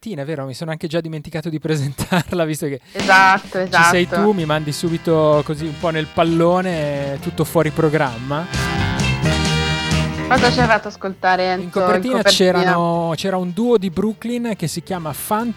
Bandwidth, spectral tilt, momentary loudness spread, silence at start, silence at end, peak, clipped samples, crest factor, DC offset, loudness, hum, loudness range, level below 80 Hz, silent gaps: 16.5 kHz; -5 dB/octave; 11 LU; 0.05 s; 0 s; -2 dBFS; under 0.1%; 16 dB; under 0.1%; -18 LUFS; none; 3 LU; -38 dBFS; none